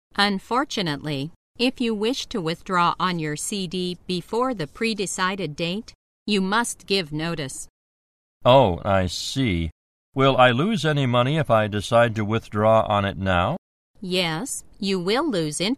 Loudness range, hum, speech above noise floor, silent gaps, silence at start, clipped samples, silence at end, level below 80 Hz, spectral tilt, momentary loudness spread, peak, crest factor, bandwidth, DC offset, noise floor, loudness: 6 LU; none; over 68 dB; 1.36-1.55 s, 5.95-6.26 s, 7.69-8.41 s, 9.72-10.12 s, 13.58-13.94 s; 0.15 s; under 0.1%; 0 s; -48 dBFS; -5 dB/octave; 11 LU; -2 dBFS; 20 dB; 14 kHz; under 0.1%; under -90 dBFS; -22 LUFS